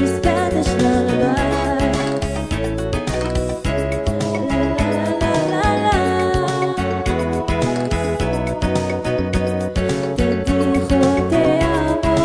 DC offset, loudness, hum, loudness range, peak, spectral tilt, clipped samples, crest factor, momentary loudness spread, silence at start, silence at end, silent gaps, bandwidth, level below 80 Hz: under 0.1%; -19 LUFS; none; 2 LU; -2 dBFS; -6 dB/octave; under 0.1%; 16 dB; 5 LU; 0 s; 0 s; none; 11 kHz; -28 dBFS